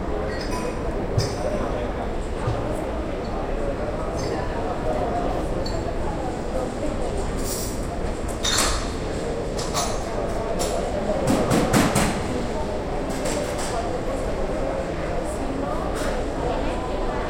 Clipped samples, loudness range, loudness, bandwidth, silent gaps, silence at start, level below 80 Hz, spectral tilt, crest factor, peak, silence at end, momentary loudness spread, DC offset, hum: under 0.1%; 4 LU; -26 LUFS; 16.5 kHz; none; 0 s; -32 dBFS; -4.5 dB/octave; 18 dB; -6 dBFS; 0 s; 7 LU; under 0.1%; none